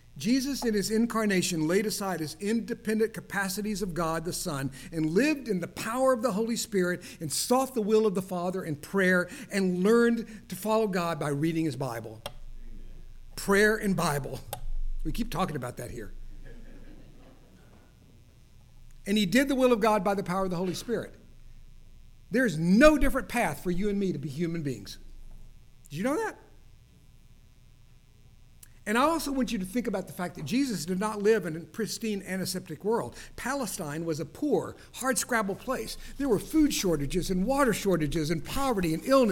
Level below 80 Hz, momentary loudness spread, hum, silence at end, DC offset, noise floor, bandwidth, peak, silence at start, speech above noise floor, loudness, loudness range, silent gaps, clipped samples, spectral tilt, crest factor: -42 dBFS; 12 LU; none; 0 s; under 0.1%; -55 dBFS; 18.5 kHz; -6 dBFS; 0.15 s; 27 dB; -28 LUFS; 9 LU; none; under 0.1%; -5 dB/octave; 22 dB